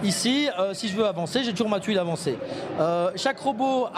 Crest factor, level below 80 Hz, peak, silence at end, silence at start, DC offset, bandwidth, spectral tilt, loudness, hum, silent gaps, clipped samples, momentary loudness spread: 16 dB; -66 dBFS; -8 dBFS; 0 s; 0 s; under 0.1%; 15.5 kHz; -4.5 dB/octave; -25 LUFS; none; none; under 0.1%; 5 LU